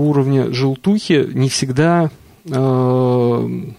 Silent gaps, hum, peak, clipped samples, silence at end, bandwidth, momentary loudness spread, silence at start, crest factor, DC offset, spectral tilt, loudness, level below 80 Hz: none; none; -2 dBFS; under 0.1%; 0.05 s; 12.5 kHz; 4 LU; 0 s; 12 dB; under 0.1%; -6.5 dB/octave; -16 LUFS; -54 dBFS